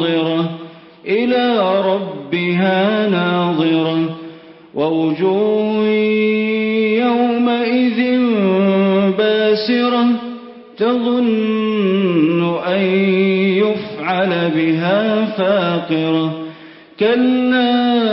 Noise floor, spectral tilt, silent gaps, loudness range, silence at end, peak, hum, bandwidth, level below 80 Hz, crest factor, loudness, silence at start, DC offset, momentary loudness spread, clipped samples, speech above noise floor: -38 dBFS; -11.5 dB/octave; none; 2 LU; 0 s; -4 dBFS; none; 5.8 kHz; -62 dBFS; 12 dB; -16 LUFS; 0 s; under 0.1%; 6 LU; under 0.1%; 23 dB